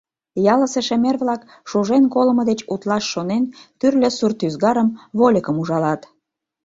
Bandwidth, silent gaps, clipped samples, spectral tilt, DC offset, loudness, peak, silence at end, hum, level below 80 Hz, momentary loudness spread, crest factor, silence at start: 8 kHz; none; under 0.1%; -5.5 dB/octave; under 0.1%; -19 LUFS; -2 dBFS; 0.65 s; none; -60 dBFS; 7 LU; 16 dB; 0.35 s